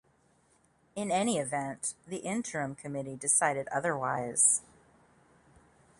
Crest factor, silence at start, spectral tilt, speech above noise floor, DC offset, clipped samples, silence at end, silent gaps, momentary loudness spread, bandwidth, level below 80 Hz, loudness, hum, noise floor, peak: 24 dB; 0.95 s; -3 dB/octave; 37 dB; under 0.1%; under 0.1%; 1.4 s; none; 14 LU; 11.5 kHz; -72 dBFS; -30 LUFS; none; -68 dBFS; -10 dBFS